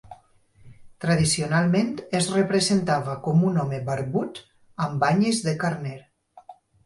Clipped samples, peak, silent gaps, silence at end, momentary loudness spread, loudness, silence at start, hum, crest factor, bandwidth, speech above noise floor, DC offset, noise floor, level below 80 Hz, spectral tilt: under 0.1%; -8 dBFS; none; 0.35 s; 11 LU; -23 LUFS; 0.05 s; none; 18 dB; 11.5 kHz; 33 dB; under 0.1%; -56 dBFS; -56 dBFS; -5 dB/octave